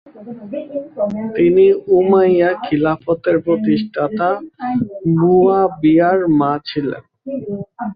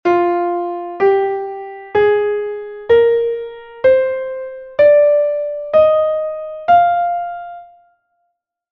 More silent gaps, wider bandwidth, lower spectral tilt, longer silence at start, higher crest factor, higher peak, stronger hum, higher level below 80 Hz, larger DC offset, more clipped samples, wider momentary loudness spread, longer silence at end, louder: neither; second, 5 kHz vs 5.6 kHz; first, -10.5 dB/octave vs -7 dB/octave; about the same, 0.15 s vs 0.05 s; about the same, 14 dB vs 14 dB; about the same, -2 dBFS vs -2 dBFS; neither; about the same, -52 dBFS vs -54 dBFS; neither; neither; about the same, 15 LU vs 14 LU; second, 0 s vs 1.05 s; about the same, -15 LUFS vs -15 LUFS